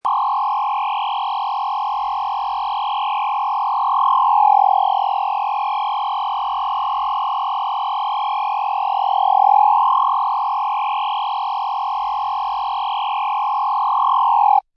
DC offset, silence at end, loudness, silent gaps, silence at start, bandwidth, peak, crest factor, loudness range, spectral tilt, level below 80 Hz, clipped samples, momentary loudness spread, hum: under 0.1%; 0.15 s; -19 LUFS; none; 0.05 s; 5.8 kHz; -4 dBFS; 14 dB; 4 LU; -0.5 dB/octave; -62 dBFS; under 0.1%; 8 LU; none